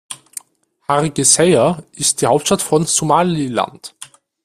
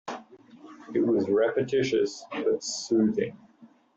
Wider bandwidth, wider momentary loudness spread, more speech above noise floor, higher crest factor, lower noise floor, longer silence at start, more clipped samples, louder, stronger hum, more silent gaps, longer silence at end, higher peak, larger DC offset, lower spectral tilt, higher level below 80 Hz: first, 16 kHz vs 8 kHz; first, 21 LU vs 11 LU; first, 42 dB vs 30 dB; about the same, 16 dB vs 14 dB; about the same, -57 dBFS vs -56 dBFS; about the same, 0.1 s vs 0.05 s; neither; first, -15 LUFS vs -27 LUFS; neither; neither; about the same, 0.4 s vs 0.3 s; first, 0 dBFS vs -12 dBFS; neither; second, -3.5 dB/octave vs -5 dB/octave; first, -52 dBFS vs -68 dBFS